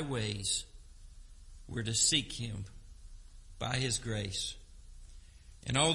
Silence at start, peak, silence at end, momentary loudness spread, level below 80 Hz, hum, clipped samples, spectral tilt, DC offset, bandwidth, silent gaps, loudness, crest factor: 0 s; -16 dBFS; 0 s; 18 LU; -52 dBFS; none; under 0.1%; -2.5 dB/octave; under 0.1%; 11.5 kHz; none; -33 LUFS; 22 dB